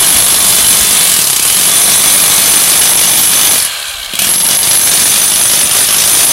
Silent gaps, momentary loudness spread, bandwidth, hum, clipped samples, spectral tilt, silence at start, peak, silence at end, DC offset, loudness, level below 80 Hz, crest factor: none; 3 LU; over 20 kHz; none; 0.7%; 1 dB/octave; 0 s; 0 dBFS; 0 s; under 0.1%; -5 LUFS; -40 dBFS; 8 dB